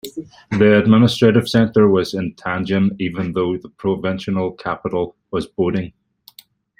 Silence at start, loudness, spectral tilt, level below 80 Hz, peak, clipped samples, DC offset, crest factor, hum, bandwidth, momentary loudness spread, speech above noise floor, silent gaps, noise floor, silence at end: 0.05 s; -18 LUFS; -7 dB/octave; -52 dBFS; -2 dBFS; under 0.1%; under 0.1%; 16 dB; none; 15.5 kHz; 12 LU; 32 dB; none; -49 dBFS; 0.9 s